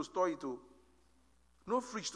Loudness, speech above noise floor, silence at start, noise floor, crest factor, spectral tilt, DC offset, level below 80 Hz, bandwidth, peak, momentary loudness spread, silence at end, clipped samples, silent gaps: -38 LUFS; 33 dB; 0 s; -71 dBFS; 18 dB; -3.5 dB/octave; under 0.1%; -72 dBFS; 11 kHz; -22 dBFS; 14 LU; 0 s; under 0.1%; none